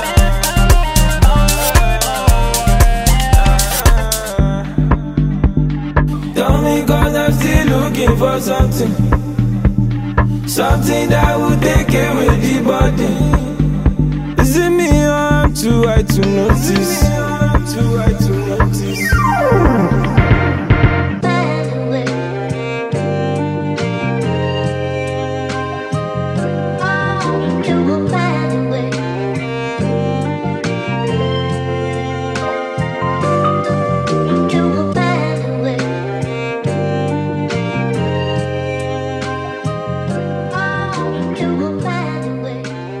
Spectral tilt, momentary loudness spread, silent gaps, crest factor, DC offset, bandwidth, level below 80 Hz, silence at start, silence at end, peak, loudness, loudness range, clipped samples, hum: -5.5 dB/octave; 8 LU; none; 14 dB; under 0.1%; 16 kHz; -20 dBFS; 0 s; 0 s; 0 dBFS; -15 LUFS; 5 LU; under 0.1%; none